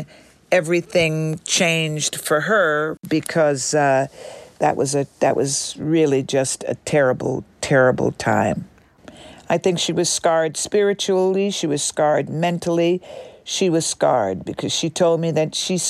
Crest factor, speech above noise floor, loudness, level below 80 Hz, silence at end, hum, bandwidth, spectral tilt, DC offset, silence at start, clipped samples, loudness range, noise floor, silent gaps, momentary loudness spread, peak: 16 dB; 26 dB; -19 LUFS; -56 dBFS; 0 s; none; 15.5 kHz; -4 dB/octave; under 0.1%; 0 s; under 0.1%; 1 LU; -45 dBFS; none; 7 LU; -4 dBFS